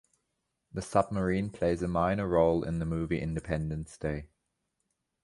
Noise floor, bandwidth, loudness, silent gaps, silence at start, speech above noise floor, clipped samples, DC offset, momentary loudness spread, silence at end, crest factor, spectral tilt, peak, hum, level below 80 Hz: -82 dBFS; 11.5 kHz; -31 LUFS; none; 0.75 s; 52 dB; under 0.1%; under 0.1%; 10 LU; 1 s; 22 dB; -7.5 dB/octave; -10 dBFS; none; -48 dBFS